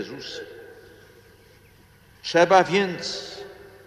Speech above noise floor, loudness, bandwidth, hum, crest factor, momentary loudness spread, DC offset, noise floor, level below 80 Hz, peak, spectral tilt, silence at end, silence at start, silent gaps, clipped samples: 32 dB; -21 LUFS; 14 kHz; none; 22 dB; 24 LU; under 0.1%; -54 dBFS; -62 dBFS; -4 dBFS; -4 dB/octave; 0.25 s; 0 s; none; under 0.1%